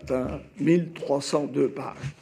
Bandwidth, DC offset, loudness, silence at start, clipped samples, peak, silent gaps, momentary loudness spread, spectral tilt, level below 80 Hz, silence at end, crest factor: 11.5 kHz; under 0.1%; -27 LUFS; 0 s; under 0.1%; -8 dBFS; none; 11 LU; -6.5 dB/octave; -52 dBFS; 0.1 s; 18 dB